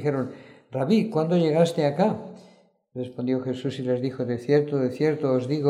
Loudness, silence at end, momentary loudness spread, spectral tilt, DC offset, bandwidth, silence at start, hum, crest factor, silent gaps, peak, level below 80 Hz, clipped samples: -25 LUFS; 0 s; 13 LU; -7.5 dB/octave; under 0.1%; 12.5 kHz; 0 s; none; 16 dB; none; -8 dBFS; -70 dBFS; under 0.1%